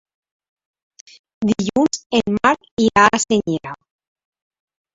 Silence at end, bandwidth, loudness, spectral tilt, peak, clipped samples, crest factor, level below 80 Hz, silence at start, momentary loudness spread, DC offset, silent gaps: 1.2 s; 8 kHz; -17 LUFS; -4 dB/octave; 0 dBFS; under 0.1%; 20 dB; -52 dBFS; 1.4 s; 12 LU; under 0.1%; 2.06-2.10 s, 2.71-2.77 s